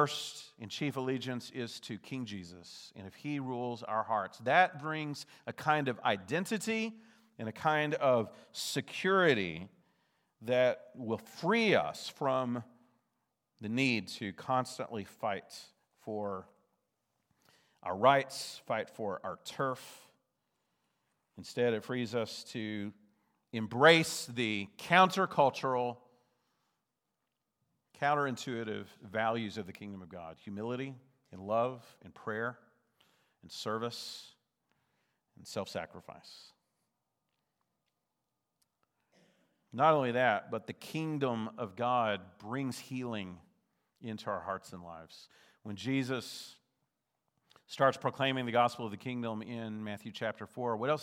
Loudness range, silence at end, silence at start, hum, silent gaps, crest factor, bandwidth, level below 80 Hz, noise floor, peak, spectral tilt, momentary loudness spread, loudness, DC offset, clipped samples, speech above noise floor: 11 LU; 0 s; 0 s; none; none; 26 dB; 16.5 kHz; -82 dBFS; -86 dBFS; -8 dBFS; -5 dB/octave; 19 LU; -34 LUFS; under 0.1%; under 0.1%; 52 dB